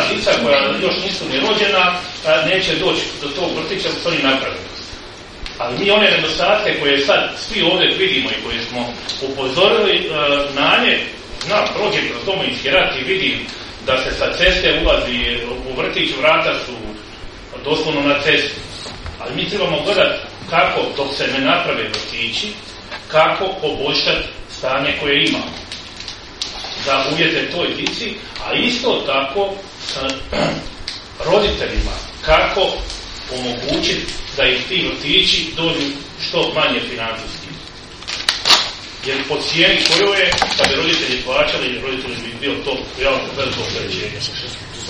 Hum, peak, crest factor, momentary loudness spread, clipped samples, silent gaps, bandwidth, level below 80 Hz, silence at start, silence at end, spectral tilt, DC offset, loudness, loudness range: none; 0 dBFS; 18 dB; 14 LU; under 0.1%; none; 11.5 kHz; -36 dBFS; 0 s; 0 s; -3 dB/octave; under 0.1%; -16 LUFS; 4 LU